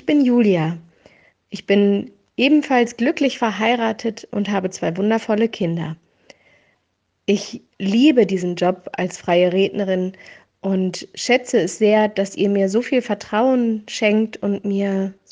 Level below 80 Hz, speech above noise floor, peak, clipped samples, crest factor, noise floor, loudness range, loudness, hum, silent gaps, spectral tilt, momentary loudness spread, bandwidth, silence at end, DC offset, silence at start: -64 dBFS; 52 dB; -2 dBFS; under 0.1%; 18 dB; -70 dBFS; 4 LU; -19 LUFS; none; none; -5.5 dB/octave; 10 LU; 9.6 kHz; 0.2 s; under 0.1%; 0.05 s